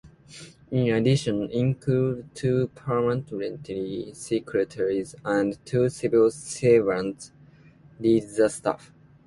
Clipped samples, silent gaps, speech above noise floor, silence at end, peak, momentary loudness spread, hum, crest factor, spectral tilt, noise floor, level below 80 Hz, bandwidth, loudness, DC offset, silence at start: under 0.1%; none; 28 dB; 0.5 s; -8 dBFS; 12 LU; none; 18 dB; -6.5 dB/octave; -52 dBFS; -58 dBFS; 11.5 kHz; -25 LUFS; under 0.1%; 0.05 s